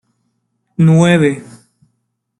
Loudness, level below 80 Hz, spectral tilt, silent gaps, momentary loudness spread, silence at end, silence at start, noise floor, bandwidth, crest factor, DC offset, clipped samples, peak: -11 LUFS; -54 dBFS; -7 dB/octave; none; 18 LU; 0.95 s; 0.8 s; -68 dBFS; 11 kHz; 14 dB; under 0.1%; under 0.1%; -2 dBFS